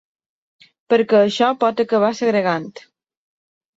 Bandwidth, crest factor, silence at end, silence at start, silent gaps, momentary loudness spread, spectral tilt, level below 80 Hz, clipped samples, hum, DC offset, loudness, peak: 7.8 kHz; 18 dB; 1 s; 0.9 s; none; 7 LU; -5.5 dB/octave; -66 dBFS; under 0.1%; none; under 0.1%; -17 LUFS; -2 dBFS